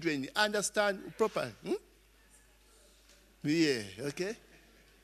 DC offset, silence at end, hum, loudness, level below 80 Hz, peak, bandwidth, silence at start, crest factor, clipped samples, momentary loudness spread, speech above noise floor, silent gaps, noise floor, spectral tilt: under 0.1%; 0.65 s; 50 Hz at -65 dBFS; -33 LUFS; -66 dBFS; -12 dBFS; 13.5 kHz; 0 s; 22 dB; under 0.1%; 10 LU; 30 dB; none; -63 dBFS; -3.5 dB/octave